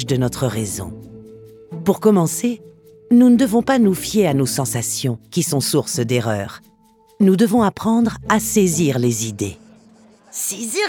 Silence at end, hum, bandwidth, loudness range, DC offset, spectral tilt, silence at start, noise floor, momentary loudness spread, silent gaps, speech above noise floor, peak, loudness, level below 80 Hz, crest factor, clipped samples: 0 s; none; 19 kHz; 3 LU; under 0.1%; -5 dB/octave; 0 s; -53 dBFS; 11 LU; none; 36 dB; -2 dBFS; -18 LUFS; -50 dBFS; 16 dB; under 0.1%